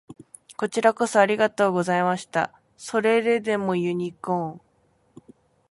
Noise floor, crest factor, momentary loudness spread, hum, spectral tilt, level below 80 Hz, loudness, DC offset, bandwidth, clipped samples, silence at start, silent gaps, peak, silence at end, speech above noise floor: -64 dBFS; 20 dB; 11 LU; none; -5 dB/octave; -68 dBFS; -23 LUFS; under 0.1%; 11.5 kHz; under 0.1%; 0.1 s; none; -4 dBFS; 1.1 s; 42 dB